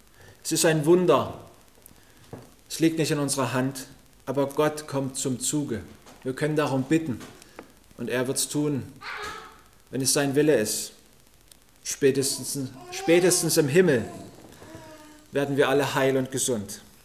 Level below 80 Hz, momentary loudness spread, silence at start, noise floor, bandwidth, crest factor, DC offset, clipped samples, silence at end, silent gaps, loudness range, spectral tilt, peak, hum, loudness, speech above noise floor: -60 dBFS; 20 LU; 0.3 s; -57 dBFS; 16 kHz; 20 dB; 0.1%; under 0.1%; 0.25 s; none; 5 LU; -4 dB/octave; -6 dBFS; none; -25 LUFS; 32 dB